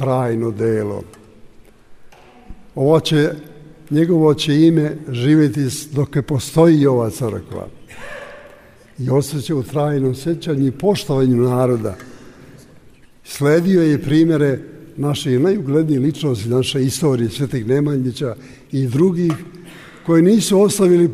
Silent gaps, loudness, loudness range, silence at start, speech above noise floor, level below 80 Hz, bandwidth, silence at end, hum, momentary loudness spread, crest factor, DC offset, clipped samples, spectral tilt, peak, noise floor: none; -17 LUFS; 5 LU; 0 s; 29 dB; -48 dBFS; 15.5 kHz; 0 s; none; 17 LU; 16 dB; under 0.1%; under 0.1%; -6.5 dB/octave; -2 dBFS; -45 dBFS